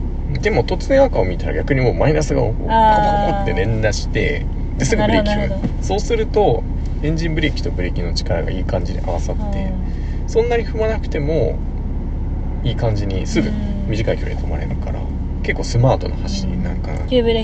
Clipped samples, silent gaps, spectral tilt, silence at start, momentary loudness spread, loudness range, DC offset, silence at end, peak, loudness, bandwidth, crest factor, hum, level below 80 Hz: under 0.1%; none; -6.5 dB/octave; 0 s; 9 LU; 5 LU; under 0.1%; 0 s; 0 dBFS; -19 LUFS; 8.4 kHz; 16 dB; none; -22 dBFS